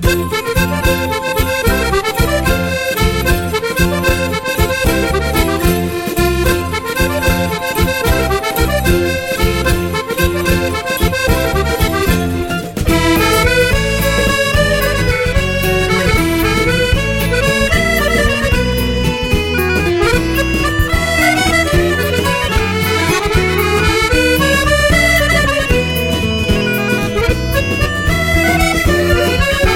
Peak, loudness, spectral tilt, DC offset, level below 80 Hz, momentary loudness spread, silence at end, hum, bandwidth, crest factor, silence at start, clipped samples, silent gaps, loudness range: 0 dBFS; -13 LUFS; -4.5 dB/octave; under 0.1%; -20 dBFS; 4 LU; 0 s; none; 17 kHz; 12 dB; 0 s; under 0.1%; none; 3 LU